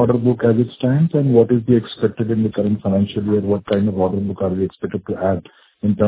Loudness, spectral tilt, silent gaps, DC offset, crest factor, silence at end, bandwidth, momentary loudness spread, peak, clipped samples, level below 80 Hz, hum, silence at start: -18 LUFS; -12.5 dB/octave; none; under 0.1%; 16 dB; 0 s; 4 kHz; 8 LU; 0 dBFS; under 0.1%; -44 dBFS; none; 0 s